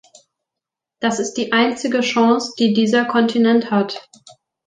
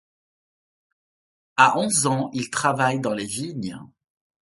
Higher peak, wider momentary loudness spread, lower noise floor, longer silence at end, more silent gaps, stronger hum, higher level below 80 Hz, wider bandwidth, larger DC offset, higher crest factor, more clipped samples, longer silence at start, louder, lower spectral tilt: about the same, -2 dBFS vs 0 dBFS; second, 7 LU vs 14 LU; second, -85 dBFS vs under -90 dBFS; about the same, 0.65 s vs 0.55 s; neither; neither; about the same, -66 dBFS vs -64 dBFS; second, 9.4 kHz vs 12 kHz; neither; second, 16 dB vs 24 dB; neither; second, 1 s vs 1.55 s; first, -17 LUFS vs -22 LUFS; about the same, -4.5 dB/octave vs -3.5 dB/octave